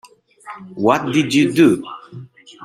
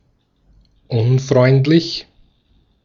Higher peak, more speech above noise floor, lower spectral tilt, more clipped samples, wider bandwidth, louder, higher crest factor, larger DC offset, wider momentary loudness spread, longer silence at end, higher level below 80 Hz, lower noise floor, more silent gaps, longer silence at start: about the same, -2 dBFS vs -2 dBFS; second, 23 dB vs 45 dB; second, -5.5 dB/octave vs -7 dB/octave; neither; first, 14.5 kHz vs 7.2 kHz; about the same, -16 LUFS vs -15 LUFS; about the same, 16 dB vs 16 dB; neither; first, 24 LU vs 12 LU; second, 0 s vs 0.8 s; second, -60 dBFS vs -52 dBFS; second, -39 dBFS vs -59 dBFS; neither; second, 0.45 s vs 0.9 s